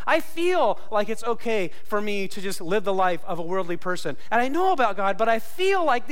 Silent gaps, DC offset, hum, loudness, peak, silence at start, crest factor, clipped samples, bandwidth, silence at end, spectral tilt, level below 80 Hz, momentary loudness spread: none; 6%; none; -25 LUFS; -10 dBFS; 0 s; 12 dB; under 0.1%; 16.5 kHz; 0 s; -4.5 dB/octave; -60 dBFS; 7 LU